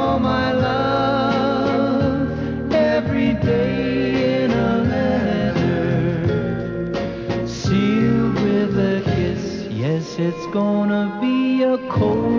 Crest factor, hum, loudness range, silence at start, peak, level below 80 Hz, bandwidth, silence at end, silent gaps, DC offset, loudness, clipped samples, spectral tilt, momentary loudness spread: 12 dB; none; 2 LU; 0 s; -6 dBFS; -38 dBFS; 7.2 kHz; 0 s; none; under 0.1%; -19 LUFS; under 0.1%; -7.5 dB/octave; 6 LU